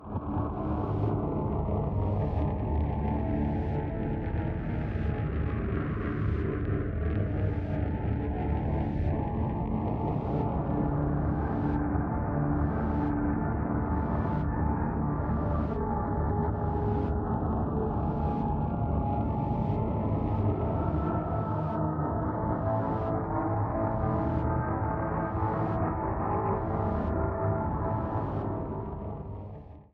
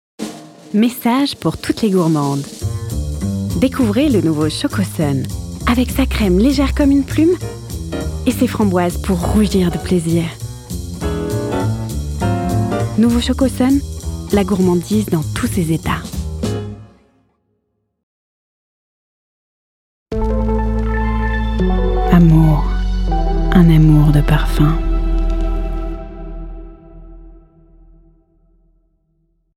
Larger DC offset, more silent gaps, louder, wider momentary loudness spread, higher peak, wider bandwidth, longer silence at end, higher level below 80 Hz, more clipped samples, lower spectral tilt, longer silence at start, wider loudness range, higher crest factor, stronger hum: neither; second, none vs 18.03-20.06 s; second, -30 LUFS vs -16 LUFS; second, 3 LU vs 13 LU; second, -16 dBFS vs 0 dBFS; second, 4.2 kHz vs 16.5 kHz; second, 0.1 s vs 2.15 s; second, -36 dBFS vs -22 dBFS; neither; first, -11.5 dB/octave vs -6.5 dB/octave; second, 0 s vs 0.2 s; second, 2 LU vs 12 LU; about the same, 14 dB vs 16 dB; neither